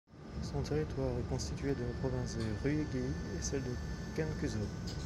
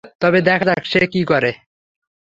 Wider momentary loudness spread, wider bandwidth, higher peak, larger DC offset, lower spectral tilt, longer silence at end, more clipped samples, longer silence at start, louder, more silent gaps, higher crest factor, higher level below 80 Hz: about the same, 5 LU vs 3 LU; first, 13 kHz vs 7.8 kHz; second, -22 dBFS vs -2 dBFS; neither; about the same, -6 dB/octave vs -7 dB/octave; second, 0 s vs 0.7 s; neither; about the same, 0.1 s vs 0.05 s; second, -38 LUFS vs -16 LUFS; second, none vs 0.15-0.19 s; about the same, 16 dB vs 16 dB; first, -46 dBFS vs -54 dBFS